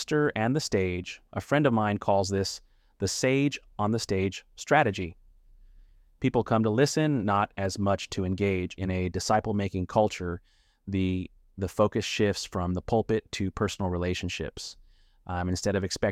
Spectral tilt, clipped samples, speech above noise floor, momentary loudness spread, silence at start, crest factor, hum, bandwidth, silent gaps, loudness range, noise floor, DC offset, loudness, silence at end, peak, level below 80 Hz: -5.5 dB/octave; under 0.1%; 28 dB; 11 LU; 0 s; 20 dB; none; 15.5 kHz; none; 3 LU; -55 dBFS; under 0.1%; -28 LUFS; 0 s; -8 dBFS; -52 dBFS